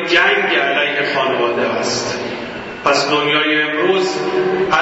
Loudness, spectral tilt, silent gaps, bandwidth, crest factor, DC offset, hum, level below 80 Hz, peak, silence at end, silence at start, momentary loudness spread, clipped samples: -15 LUFS; -3 dB/octave; none; 8 kHz; 16 dB; under 0.1%; none; -54 dBFS; 0 dBFS; 0 s; 0 s; 8 LU; under 0.1%